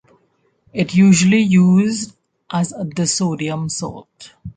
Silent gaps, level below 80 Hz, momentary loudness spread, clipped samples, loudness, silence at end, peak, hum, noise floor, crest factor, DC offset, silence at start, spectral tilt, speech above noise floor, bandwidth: none; -52 dBFS; 17 LU; under 0.1%; -16 LUFS; 0.05 s; -2 dBFS; none; -62 dBFS; 14 dB; under 0.1%; 0.75 s; -5.5 dB/octave; 46 dB; 9.4 kHz